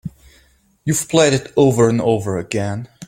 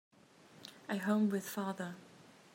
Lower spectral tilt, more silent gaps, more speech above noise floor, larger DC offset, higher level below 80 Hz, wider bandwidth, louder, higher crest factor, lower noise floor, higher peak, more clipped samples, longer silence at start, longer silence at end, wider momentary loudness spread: about the same, -5 dB/octave vs -5.5 dB/octave; neither; first, 39 dB vs 26 dB; neither; first, -50 dBFS vs -88 dBFS; about the same, 16.5 kHz vs 16 kHz; first, -17 LUFS vs -37 LUFS; about the same, 16 dB vs 20 dB; second, -55 dBFS vs -62 dBFS; first, 0 dBFS vs -20 dBFS; neither; second, 0.05 s vs 0.55 s; second, 0 s vs 0.3 s; second, 11 LU vs 21 LU